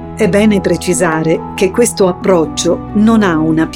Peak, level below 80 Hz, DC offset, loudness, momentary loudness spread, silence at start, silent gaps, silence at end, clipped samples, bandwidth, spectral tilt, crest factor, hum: 0 dBFS; -36 dBFS; under 0.1%; -12 LUFS; 4 LU; 0 s; none; 0 s; under 0.1%; 16.5 kHz; -5 dB/octave; 12 dB; none